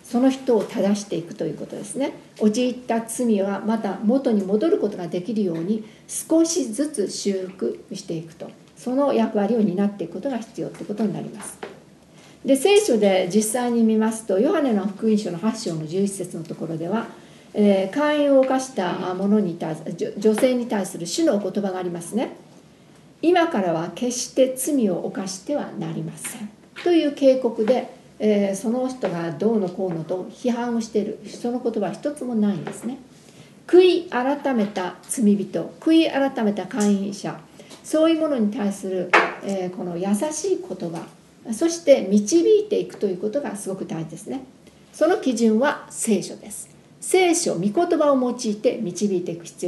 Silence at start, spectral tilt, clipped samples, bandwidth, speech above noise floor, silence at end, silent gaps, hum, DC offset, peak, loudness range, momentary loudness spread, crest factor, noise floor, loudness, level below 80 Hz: 0.05 s; -5 dB/octave; under 0.1%; 12.5 kHz; 28 dB; 0 s; none; none; under 0.1%; 0 dBFS; 4 LU; 13 LU; 22 dB; -50 dBFS; -22 LUFS; -68 dBFS